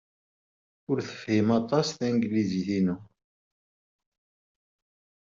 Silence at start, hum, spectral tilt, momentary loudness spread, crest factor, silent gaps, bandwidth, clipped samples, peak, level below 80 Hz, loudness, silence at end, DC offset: 0.9 s; none; -6.5 dB/octave; 7 LU; 20 dB; none; 7.6 kHz; under 0.1%; -10 dBFS; -66 dBFS; -27 LUFS; 2.25 s; under 0.1%